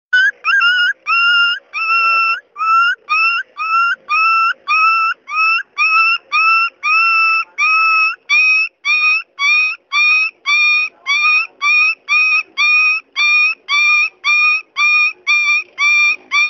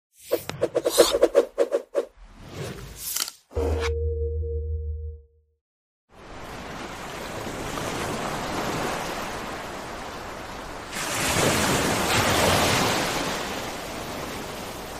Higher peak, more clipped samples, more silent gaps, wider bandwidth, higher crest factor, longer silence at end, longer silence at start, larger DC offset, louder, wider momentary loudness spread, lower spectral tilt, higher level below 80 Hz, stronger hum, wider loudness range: about the same, -2 dBFS vs -4 dBFS; neither; second, none vs 5.61-6.08 s; second, 7.2 kHz vs 15.5 kHz; second, 12 dB vs 22 dB; about the same, 0 s vs 0 s; about the same, 0.1 s vs 0.2 s; neither; first, -12 LUFS vs -26 LUFS; second, 4 LU vs 16 LU; second, 4 dB/octave vs -3.5 dB/octave; second, -78 dBFS vs -38 dBFS; neither; second, 2 LU vs 11 LU